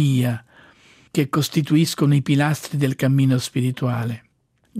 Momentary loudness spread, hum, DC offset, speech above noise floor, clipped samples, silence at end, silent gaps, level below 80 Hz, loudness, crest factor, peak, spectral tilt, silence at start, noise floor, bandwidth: 9 LU; none; under 0.1%; 34 dB; under 0.1%; 0 s; none; -62 dBFS; -20 LUFS; 14 dB; -6 dBFS; -6 dB/octave; 0 s; -53 dBFS; 15.5 kHz